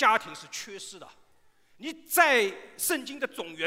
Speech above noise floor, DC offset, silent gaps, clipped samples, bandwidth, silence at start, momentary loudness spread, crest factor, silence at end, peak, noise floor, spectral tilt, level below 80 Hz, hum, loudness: 32 dB; under 0.1%; none; under 0.1%; 16 kHz; 0 s; 20 LU; 22 dB; 0 s; -8 dBFS; -61 dBFS; -1 dB/octave; -76 dBFS; none; -27 LUFS